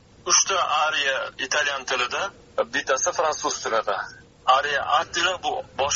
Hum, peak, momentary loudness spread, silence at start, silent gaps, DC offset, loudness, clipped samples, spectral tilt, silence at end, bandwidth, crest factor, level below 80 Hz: none; -4 dBFS; 9 LU; 0.25 s; none; under 0.1%; -23 LUFS; under 0.1%; 1 dB/octave; 0 s; 7.6 kHz; 20 dB; -58 dBFS